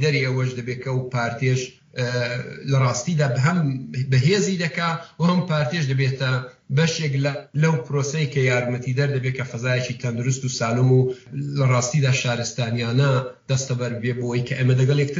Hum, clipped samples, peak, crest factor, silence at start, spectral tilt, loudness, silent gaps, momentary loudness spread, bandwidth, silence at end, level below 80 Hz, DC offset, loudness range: none; under 0.1%; -6 dBFS; 14 dB; 0 s; -6 dB/octave; -22 LUFS; none; 7 LU; 7.6 kHz; 0 s; -60 dBFS; under 0.1%; 2 LU